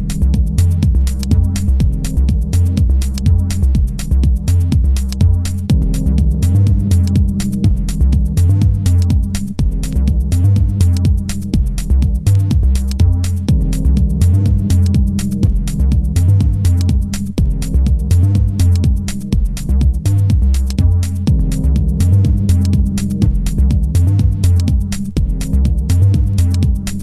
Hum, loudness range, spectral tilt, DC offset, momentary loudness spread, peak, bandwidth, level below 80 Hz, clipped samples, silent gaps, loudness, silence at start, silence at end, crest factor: none; 1 LU; -7 dB/octave; under 0.1%; 4 LU; 0 dBFS; 14 kHz; -16 dBFS; under 0.1%; none; -15 LUFS; 0 s; 0 s; 12 dB